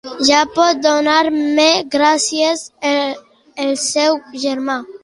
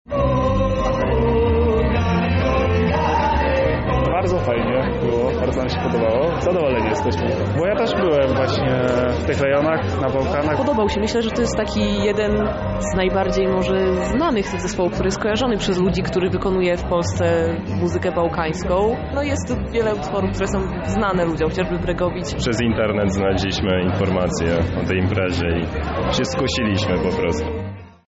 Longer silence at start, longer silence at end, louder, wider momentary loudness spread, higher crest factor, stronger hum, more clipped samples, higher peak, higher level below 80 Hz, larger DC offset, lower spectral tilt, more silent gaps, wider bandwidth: about the same, 0.05 s vs 0.1 s; second, 0.05 s vs 0.2 s; first, -15 LUFS vs -20 LUFS; first, 9 LU vs 4 LU; about the same, 16 dB vs 12 dB; neither; neither; first, 0 dBFS vs -8 dBFS; second, -60 dBFS vs -30 dBFS; neither; second, -1 dB/octave vs -5.5 dB/octave; neither; first, 11.5 kHz vs 8 kHz